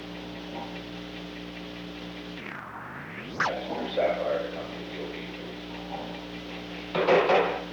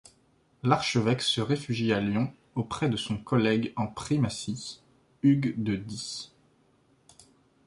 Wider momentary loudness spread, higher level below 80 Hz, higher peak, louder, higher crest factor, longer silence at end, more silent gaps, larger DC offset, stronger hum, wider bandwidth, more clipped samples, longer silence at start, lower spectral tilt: first, 15 LU vs 11 LU; about the same, -56 dBFS vs -58 dBFS; about the same, -10 dBFS vs -8 dBFS; second, -31 LUFS vs -28 LUFS; about the same, 20 dB vs 22 dB; second, 0 s vs 1.4 s; neither; neither; first, 60 Hz at -55 dBFS vs none; first, over 20 kHz vs 11.5 kHz; neither; second, 0 s vs 0.65 s; about the same, -5.5 dB/octave vs -5.5 dB/octave